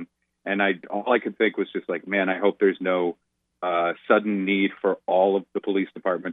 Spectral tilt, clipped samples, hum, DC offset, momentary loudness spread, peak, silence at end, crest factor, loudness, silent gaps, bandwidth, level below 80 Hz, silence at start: -9 dB/octave; under 0.1%; none; under 0.1%; 8 LU; -6 dBFS; 0 s; 18 dB; -24 LUFS; none; 4 kHz; -80 dBFS; 0 s